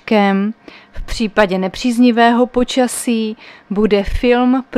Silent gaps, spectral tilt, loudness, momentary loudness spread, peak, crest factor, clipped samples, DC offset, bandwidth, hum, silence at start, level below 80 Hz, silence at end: none; -5 dB/octave; -15 LUFS; 12 LU; 0 dBFS; 14 dB; under 0.1%; under 0.1%; 14.5 kHz; none; 0.05 s; -32 dBFS; 0 s